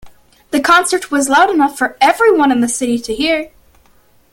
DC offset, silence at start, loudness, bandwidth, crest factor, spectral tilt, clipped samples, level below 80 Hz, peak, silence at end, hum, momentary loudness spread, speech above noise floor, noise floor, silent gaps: under 0.1%; 0.05 s; -13 LUFS; 17 kHz; 14 dB; -2.5 dB/octave; under 0.1%; -48 dBFS; 0 dBFS; 0.85 s; none; 7 LU; 37 dB; -50 dBFS; none